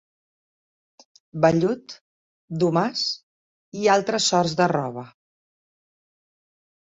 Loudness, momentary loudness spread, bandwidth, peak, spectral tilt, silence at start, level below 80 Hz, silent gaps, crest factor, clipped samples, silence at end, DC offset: -22 LUFS; 17 LU; 8.4 kHz; -4 dBFS; -4.5 dB/octave; 1.35 s; -64 dBFS; 2.01-2.48 s, 3.23-3.72 s; 22 dB; under 0.1%; 1.85 s; under 0.1%